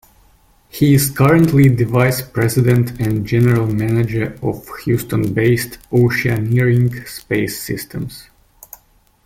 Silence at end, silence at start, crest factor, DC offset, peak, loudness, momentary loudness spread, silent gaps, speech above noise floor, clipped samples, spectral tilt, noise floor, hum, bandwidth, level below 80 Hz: 1.05 s; 0.75 s; 14 dB; under 0.1%; -2 dBFS; -16 LUFS; 12 LU; none; 38 dB; under 0.1%; -6.5 dB/octave; -53 dBFS; none; 16.5 kHz; -42 dBFS